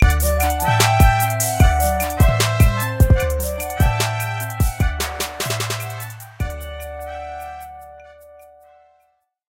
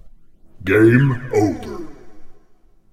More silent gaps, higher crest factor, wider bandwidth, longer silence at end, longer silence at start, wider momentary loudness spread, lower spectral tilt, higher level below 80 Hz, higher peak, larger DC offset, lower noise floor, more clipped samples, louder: neither; about the same, 18 dB vs 18 dB; first, 17 kHz vs 14 kHz; first, 1.5 s vs 0.55 s; about the same, 0 s vs 0.05 s; second, 16 LU vs 21 LU; second, -4.5 dB/octave vs -8 dB/octave; first, -24 dBFS vs -44 dBFS; about the same, 0 dBFS vs 0 dBFS; neither; first, -64 dBFS vs -49 dBFS; neither; about the same, -18 LUFS vs -16 LUFS